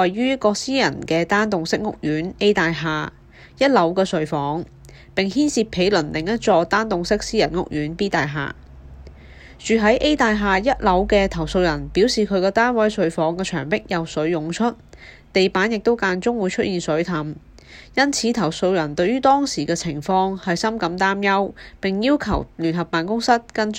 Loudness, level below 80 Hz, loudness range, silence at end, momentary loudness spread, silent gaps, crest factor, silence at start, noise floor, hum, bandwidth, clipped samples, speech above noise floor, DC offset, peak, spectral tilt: -20 LUFS; -42 dBFS; 3 LU; 0 s; 7 LU; none; 18 dB; 0 s; -42 dBFS; none; 15.5 kHz; under 0.1%; 23 dB; under 0.1%; -2 dBFS; -5 dB/octave